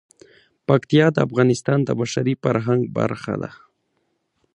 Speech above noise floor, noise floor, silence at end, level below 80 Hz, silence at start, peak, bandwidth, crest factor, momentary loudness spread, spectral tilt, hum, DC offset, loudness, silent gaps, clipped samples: 51 dB; -71 dBFS; 1 s; -58 dBFS; 0.7 s; -2 dBFS; 10.5 kHz; 20 dB; 11 LU; -6.5 dB/octave; none; under 0.1%; -20 LUFS; none; under 0.1%